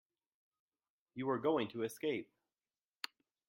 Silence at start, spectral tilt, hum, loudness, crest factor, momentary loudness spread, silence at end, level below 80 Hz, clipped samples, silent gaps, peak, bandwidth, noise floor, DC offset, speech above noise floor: 1.15 s; -5.5 dB/octave; none; -40 LUFS; 22 dB; 13 LU; 1.25 s; -84 dBFS; under 0.1%; none; -20 dBFS; 16.5 kHz; under -90 dBFS; under 0.1%; over 52 dB